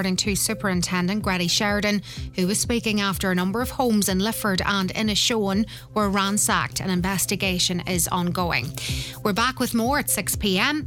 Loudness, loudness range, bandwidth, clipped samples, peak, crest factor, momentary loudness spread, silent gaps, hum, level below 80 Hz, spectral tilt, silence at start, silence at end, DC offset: -22 LUFS; 1 LU; 19.5 kHz; under 0.1%; -6 dBFS; 18 dB; 5 LU; none; none; -42 dBFS; -3.5 dB/octave; 0 s; 0 s; under 0.1%